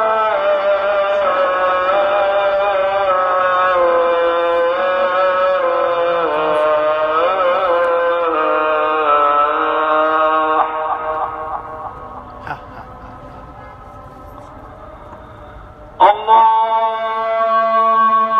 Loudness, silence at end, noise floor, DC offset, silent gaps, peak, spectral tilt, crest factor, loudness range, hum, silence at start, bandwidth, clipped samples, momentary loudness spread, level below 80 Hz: -15 LUFS; 0 s; -36 dBFS; under 0.1%; none; 0 dBFS; -5.5 dB/octave; 16 dB; 16 LU; none; 0 s; 6.6 kHz; under 0.1%; 22 LU; -48 dBFS